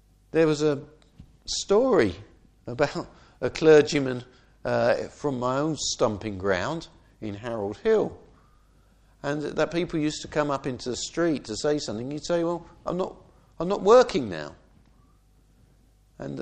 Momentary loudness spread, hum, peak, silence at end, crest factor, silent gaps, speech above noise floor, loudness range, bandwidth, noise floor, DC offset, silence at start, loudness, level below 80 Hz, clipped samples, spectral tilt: 18 LU; none; -6 dBFS; 0 s; 20 dB; none; 34 dB; 5 LU; 9.6 kHz; -59 dBFS; under 0.1%; 0.35 s; -25 LUFS; -54 dBFS; under 0.1%; -5 dB/octave